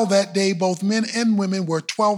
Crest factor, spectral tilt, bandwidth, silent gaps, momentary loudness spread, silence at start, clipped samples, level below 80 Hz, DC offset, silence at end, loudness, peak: 14 dB; -5 dB/octave; 12.5 kHz; none; 4 LU; 0 s; under 0.1%; -76 dBFS; under 0.1%; 0 s; -21 LUFS; -6 dBFS